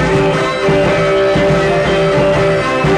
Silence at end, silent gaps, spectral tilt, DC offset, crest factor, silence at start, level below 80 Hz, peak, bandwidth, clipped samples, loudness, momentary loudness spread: 0 s; none; -6 dB/octave; under 0.1%; 10 dB; 0 s; -30 dBFS; -2 dBFS; 11 kHz; under 0.1%; -12 LUFS; 2 LU